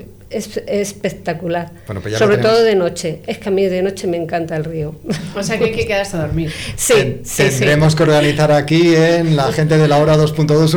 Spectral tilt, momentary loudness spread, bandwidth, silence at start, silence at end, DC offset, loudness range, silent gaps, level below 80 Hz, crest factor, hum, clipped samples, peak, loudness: -5.5 dB/octave; 12 LU; 19.5 kHz; 0 s; 0 s; under 0.1%; 7 LU; none; -40 dBFS; 8 dB; none; under 0.1%; -6 dBFS; -15 LUFS